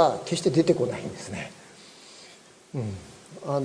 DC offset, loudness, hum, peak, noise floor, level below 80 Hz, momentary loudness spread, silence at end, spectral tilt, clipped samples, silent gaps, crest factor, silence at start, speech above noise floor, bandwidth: under 0.1%; -27 LUFS; none; -6 dBFS; -51 dBFS; -62 dBFS; 24 LU; 0 s; -6 dB/octave; under 0.1%; none; 22 dB; 0 s; 26 dB; 11 kHz